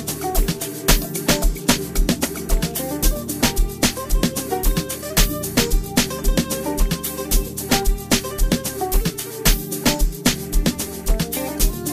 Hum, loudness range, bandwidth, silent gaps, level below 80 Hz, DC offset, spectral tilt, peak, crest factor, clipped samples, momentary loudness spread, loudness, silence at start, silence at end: none; 1 LU; 15.5 kHz; none; -22 dBFS; under 0.1%; -3.5 dB/octave; 0 dBFS; 20 dB; under 0.1%; 4 LU; -21 LUFS; 0 s; 0 s